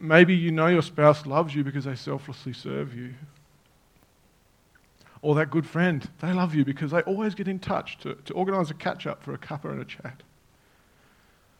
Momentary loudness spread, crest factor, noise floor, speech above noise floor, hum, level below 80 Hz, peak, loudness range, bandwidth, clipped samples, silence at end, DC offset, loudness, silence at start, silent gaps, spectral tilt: 17 LU; 26 dB; -62 dBFS; 37 dB; none; -64 dBFS; -2 dBFS; 9 LU; 10 kHz; under 0.1%; 1.45 s; under 0.1%; -26 LUFS; 0 s; none; -7.5 dB/octave